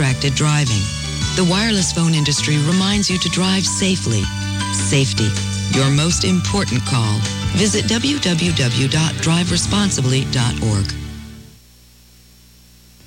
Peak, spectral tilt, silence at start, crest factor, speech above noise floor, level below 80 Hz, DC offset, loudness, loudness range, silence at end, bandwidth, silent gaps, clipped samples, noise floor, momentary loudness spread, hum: -4 dBFS; -4 dB/octave; 0 s; 12 dB; 30 dB; -36 dBFS; under 0.1%; -17 LUFS; 3 LU; 1.6 s; 16.5 kHz; none; under 0.1%; -47 dBFS; 5 LU; 60 Hz at -40 dBFS